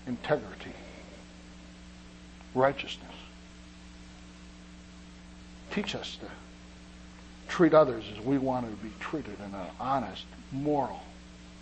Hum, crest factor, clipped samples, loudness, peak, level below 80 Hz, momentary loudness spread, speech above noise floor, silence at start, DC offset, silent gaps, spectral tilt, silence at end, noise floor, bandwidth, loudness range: none; 24 dB; under 0.1%; -30 LUFS; -10 dBFS; -54 dBFS; 22 LU; 20 dB; 0 s; under 0.1%; none; -6 dB/octave; 0 s; -50 dBFS; 8.8 kHz; 12 LU